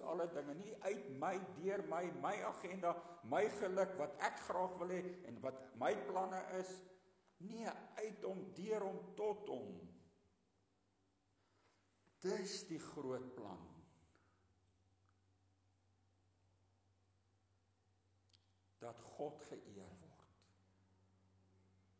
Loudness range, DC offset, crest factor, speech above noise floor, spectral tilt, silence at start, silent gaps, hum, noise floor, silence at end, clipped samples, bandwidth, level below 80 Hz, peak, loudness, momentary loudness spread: 14 LU; under 0.1%; 22 dB; 37 dB; -5 dB/octave; 0 s; none; none; -81 dBFS; 1.75 s; under 0.1%; 8 kHz; -82 dBFS; -24 dBFS; -45 LUFS; 15 LU